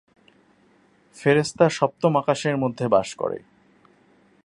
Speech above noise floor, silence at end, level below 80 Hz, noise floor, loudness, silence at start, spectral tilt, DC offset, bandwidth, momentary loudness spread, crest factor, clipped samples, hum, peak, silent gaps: 38 dB; 1.05 s; -62 dBFS; -59 dBFS; -22 LUFS; 1.15 s; -5.5 dB/octave; under 0.1%; 11.5 kHz; 9 LU; 22 dB; under 0.1%; none; -2 dBFS; none